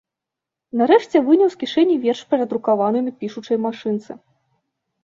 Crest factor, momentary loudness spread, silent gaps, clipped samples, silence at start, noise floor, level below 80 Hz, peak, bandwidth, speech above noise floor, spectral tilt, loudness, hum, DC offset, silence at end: 18 dB; 12 LU; none; under 0.1%; 0.75 s; -85 dBFS; -68 dBFS; -2 dBFS; 7.4 kHz; 67 dB; -6 dB/octave; -19 LUFS; none; under 0.1%; 0.9 s